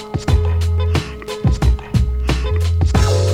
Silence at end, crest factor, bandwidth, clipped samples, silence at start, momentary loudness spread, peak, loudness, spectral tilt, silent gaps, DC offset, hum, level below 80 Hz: 0 s; 14 dB; 12.5 kHz; under 0.1%; 0 s; 5 LU; -2 dBFS; -18 LUFS; -6.5 dB/octave; none; under 0.1%; none; -20 dBFS